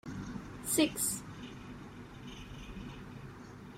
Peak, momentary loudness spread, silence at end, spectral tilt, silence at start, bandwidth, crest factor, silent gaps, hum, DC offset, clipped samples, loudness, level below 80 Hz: -16 dBFS; 18 LU; 0 s; -3.5 dB/octave; 0.05 s; 16 kHz; 24 dB; none; none; under 0.1%; under 0.1%; -36 LUFS; -56 dBFS